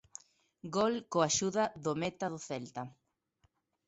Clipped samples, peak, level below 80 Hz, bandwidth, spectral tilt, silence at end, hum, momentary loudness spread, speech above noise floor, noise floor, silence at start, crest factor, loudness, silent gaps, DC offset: under 0.1%; -16 dBFS; -70 dBFS; 8.2 kHz; -4 dB/octave; 0.95 s; none; 19 LU; 41 dB; -75 dBFS; 0.65 s; 20 dB; -34 LUFS; none; under 0.1%